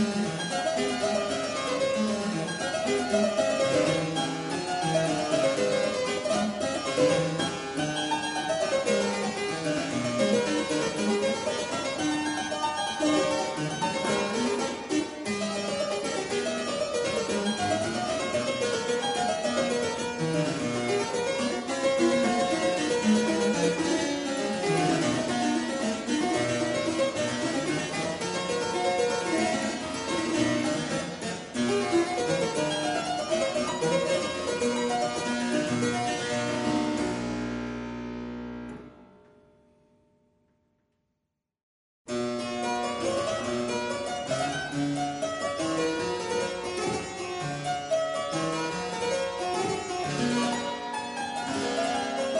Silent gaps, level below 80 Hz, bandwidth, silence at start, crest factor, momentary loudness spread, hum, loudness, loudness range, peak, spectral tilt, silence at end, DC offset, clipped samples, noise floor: 41.63-42.05 s; -60 dBFS; 11 kHz; 0 s; 16 dB; 6 LU; none; -28 LUFS; 5 LU; -12 dBFS; -4 dB/octave; 0 s; under 0.1%; under 0.1%; -82 dBFS